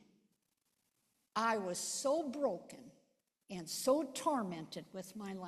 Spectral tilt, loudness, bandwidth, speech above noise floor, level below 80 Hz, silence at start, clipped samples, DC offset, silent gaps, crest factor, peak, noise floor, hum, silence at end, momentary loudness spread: -3.5 dB/octave; -38 LUFS; 14 kHz; 45 dB; -82 dBFS; 1.35 s; under 0.1%; under 0.1%; none; 20 dB; -20 dBFS; -83 dBFS; none; 0 s; 14 LU